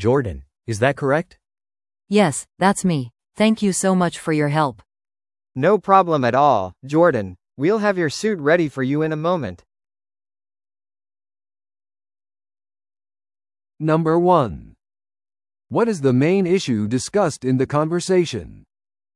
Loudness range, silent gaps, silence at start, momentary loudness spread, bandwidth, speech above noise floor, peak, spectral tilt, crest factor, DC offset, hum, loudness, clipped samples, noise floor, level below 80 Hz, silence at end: 6 LU; none; 0 s; 10 LU; 12 kHz; over 72 dB; 0 dBFS; -6 dB/octave; 20 dB; under 0.1%; none; -19 LUFS; under 0.1%; under -90 dBFS; -54 dBFS; 0.55 s